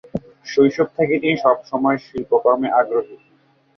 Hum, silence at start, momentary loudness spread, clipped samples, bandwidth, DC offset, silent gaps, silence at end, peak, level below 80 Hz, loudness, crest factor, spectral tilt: none; 0.15 s; 8 LU; under 0.1%; 6.6 kHz; under 0.1%; none; 0.6 s; -2 dBFS; -56 dBFS; -18 LUFS; 18 dB; -6.5 dB/octave